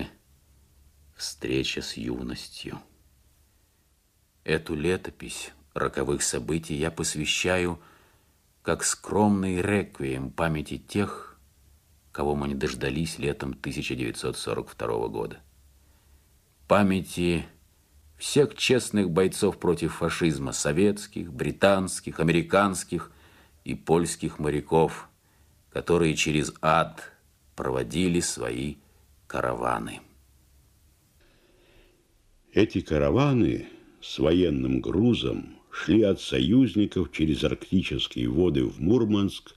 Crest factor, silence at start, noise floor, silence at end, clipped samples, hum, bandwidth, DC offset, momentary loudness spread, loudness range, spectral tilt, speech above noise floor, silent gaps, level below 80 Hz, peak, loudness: 22 dB; 0 s; -66 dBFS; 0.05 s; under 0.1%; none; 15 kHz; under 0.1%; 14 LU; 9 LU; -5 dB/octave; 40 dB; none; -48 dBFS; -6 dBFS; -26 LUFS